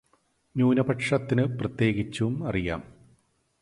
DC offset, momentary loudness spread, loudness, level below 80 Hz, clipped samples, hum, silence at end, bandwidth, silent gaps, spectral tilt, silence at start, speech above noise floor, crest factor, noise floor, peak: under 0.1%; 8 LU; -27 LUFS; -50 dBFS; under 0.1%; none; 0.75 s; 11.5 kHz; none; -7 dB/octave; 0.55 s; 43 dB; 18 dB; -68 dBFS; -10 dBFS